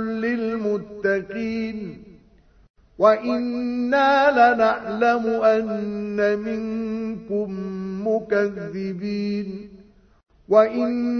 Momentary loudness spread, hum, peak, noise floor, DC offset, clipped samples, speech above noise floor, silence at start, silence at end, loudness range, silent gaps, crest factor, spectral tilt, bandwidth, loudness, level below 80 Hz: 13 LU; none; -2 dBFS; -54 dBFS; under 0.1%; under 0.1%; 33 dB; 0 s; 0 s; 7 LU; 2.70-2.74 s; 20 dB; -7 dB/octave; 6.6 kHz; -22 LUFS; -56 dBFS